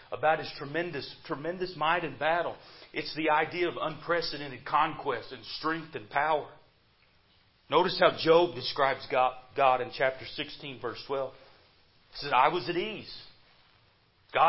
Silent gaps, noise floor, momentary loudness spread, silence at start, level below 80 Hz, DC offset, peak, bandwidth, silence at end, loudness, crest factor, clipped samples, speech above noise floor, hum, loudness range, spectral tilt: none; -65 dBFS; 14 LU; 0.1 s; -64 dBFS; under 0.1%; -8 dBFS; 5.8 kHz; 0 s; -30 LUFS; 22 dB; under 0.1%; 36 dB; none; 6 LU; -8 dB/octave